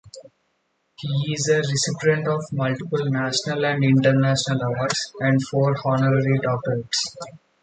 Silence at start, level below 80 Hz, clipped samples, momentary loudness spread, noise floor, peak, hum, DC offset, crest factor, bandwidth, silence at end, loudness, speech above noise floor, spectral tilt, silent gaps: 0.05 s; -60 dBFS; under 0.1%; 7 LU; -70 dBFS; -4 dBFS; none; under 0.1%; 18 dB; 9.4 kHz; 0.25 s; -21 LUFS; 49 dB; -5 dB/octave; none